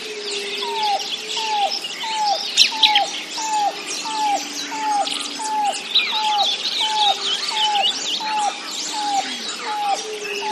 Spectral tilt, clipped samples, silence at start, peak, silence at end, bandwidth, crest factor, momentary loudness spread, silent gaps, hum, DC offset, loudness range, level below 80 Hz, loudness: 1 dB/octave; under 0.1%; 0 s; 0 dBFS; 0 s; 13.5 kHz; 22 dB; 9 LU; none; none; under 0.1%; 2 LU; -82 dBFS; -20 LUFS